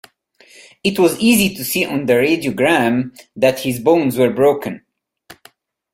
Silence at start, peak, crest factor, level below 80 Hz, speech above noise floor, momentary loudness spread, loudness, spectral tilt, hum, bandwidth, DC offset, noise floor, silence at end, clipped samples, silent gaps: 0.85 s; -2 dBFS; 16 dB; -54 dBFS; 35 dB; 8 LU; -16 LUFS; -4.5 dB/octave; none; 16.5 kHz; under 0.1%; -50 dBFS; 0.6 s; under 0.1%; none